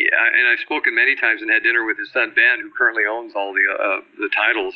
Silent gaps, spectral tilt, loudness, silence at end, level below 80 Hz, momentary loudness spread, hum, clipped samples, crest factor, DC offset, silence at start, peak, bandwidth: none; -4 dB/octave; -17 LUFS; 0 s; -70 dBFS; 8 LU; none; under 0.1%; 16 dB; under 0.1%; 0 s; -2 dBFS; 5.6 kHz